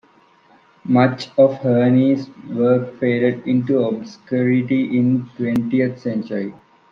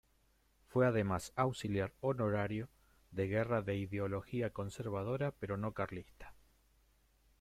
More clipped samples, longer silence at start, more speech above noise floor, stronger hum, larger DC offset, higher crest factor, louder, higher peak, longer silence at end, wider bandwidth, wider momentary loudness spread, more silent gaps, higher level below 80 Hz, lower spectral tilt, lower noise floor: neither; first, 0.85 s vs 0.7 s; about the same, 36 dB vs 36 dB; neither; neither; about the same, 16 dB vs 20 dB; first, -18 LUFS vs -38 LUFS; first, -2 dBFS vs -18 dBFS; second, 0.4 s vs 1.1 s; second, 6.6 kHz vs 15 kHz; about the same, 10 LU vs 9 LU; neither; about the same, -62 dBFS vs -64 dBFS; first, -8.5 dB/octave vs -7 dB/octave; second, -53 dBFS vs -73 dBFS